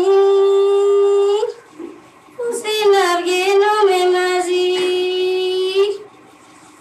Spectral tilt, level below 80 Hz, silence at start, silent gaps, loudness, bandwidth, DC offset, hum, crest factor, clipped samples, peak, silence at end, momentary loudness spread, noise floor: -2 dB/octave; -74 dBFS; 0 s; none; -15 LUFS; 13 kHz; under 0.1%; none; 12 dB; under 0.1%; -4 dBFS; 0.75 s; 13 LU; -44 dBFS